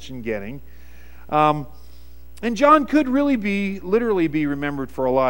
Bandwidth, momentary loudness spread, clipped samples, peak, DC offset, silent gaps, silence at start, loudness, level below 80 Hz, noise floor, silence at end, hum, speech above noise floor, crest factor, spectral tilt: 16.5 kHz; 14 LU; under 0.1%; -2 dBFS; 1%; none; 0 s; -20 LUFS; -44 dBFS; -45 dBFS; 0 s; none; 25 dB; 20 dB; -6.5 dB/octave